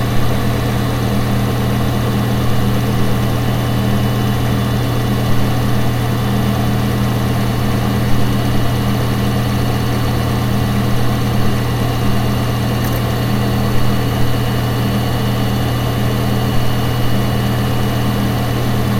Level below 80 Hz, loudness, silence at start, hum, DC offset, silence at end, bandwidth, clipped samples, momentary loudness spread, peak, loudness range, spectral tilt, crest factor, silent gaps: -26 dBFS; -17 LUFS; 0 s; none; under 0.1%; 0 s; 16.5 kHz; under 0.1%; 1 LU; 0 dBFS; 0 LU; -6.5 dB/octave; 14 dB; none